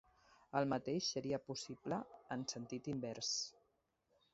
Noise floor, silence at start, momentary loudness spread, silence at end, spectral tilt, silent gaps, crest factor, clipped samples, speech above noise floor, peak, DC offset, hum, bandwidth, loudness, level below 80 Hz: -82 dBFS; 0.55 s; 8 LU; 0.8 s; -4 dB/octave; none; 22 dB; under 0.1%; 39 dB; -22 dBFS; under 0.1%; none; 7.6 kHz; -42 LUFS; -76 dBFS